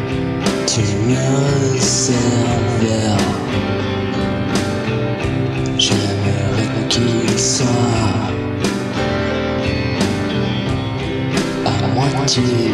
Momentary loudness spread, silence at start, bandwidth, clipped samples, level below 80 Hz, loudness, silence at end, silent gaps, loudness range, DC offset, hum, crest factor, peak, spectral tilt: 5 LU; 0 s; 13 kHz; under 0.1%; -36 dBFS; -17 LUFS; 0 s; none; 3 LU; under 0.1%; none; 16 dB; 0 dBFS; -4.5 dB/octave